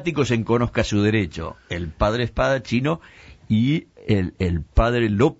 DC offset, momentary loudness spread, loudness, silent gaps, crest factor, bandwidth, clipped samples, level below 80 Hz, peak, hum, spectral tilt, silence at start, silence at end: under 0.1%; 9 LU; -22 LUFS; none; 18 dB; 8 kHz; under 0.1%; -32 dBFS; -4 dBFS; none; -6.5 dB/octave; 0 s; 0.05 s